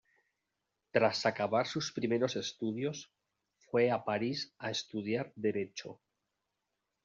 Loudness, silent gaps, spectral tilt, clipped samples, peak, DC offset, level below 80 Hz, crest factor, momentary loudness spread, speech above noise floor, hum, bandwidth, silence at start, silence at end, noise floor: -34 LUFS; none; -3.5 dB/octave; under 0.1%; -14 dBFS; under 0.1%; -78 dBFS; 22 dB; 9 LU; 52 dB; none; 7.6 kHz; 0.95 s; 1.1 s; -86 dBFS